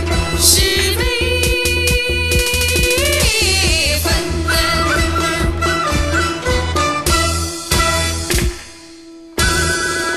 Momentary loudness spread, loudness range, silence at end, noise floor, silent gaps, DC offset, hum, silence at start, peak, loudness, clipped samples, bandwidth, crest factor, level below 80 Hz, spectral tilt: 5 LU; 3 LU; 0 s; -37 dBFS; none; under 0.1%; none; 0 s; 0 dBFS; -15 LUFS; under 0.1%; 13.5 kHz; 16 dB; -22 dBFS; -3 dB/octave